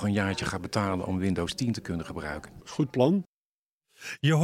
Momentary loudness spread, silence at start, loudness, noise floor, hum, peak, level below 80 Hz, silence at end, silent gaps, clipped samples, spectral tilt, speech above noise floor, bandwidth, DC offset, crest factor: 14 LU; 0 s; -29 LUFS; under -90 dBFS; none; -10 dBFS; -56 dBFS; 0 s; 3.28-3.81 s; under 0.1%; -6 dB/octave; over 62 dB; 15.5 kHz; under 0.1%; 20 dB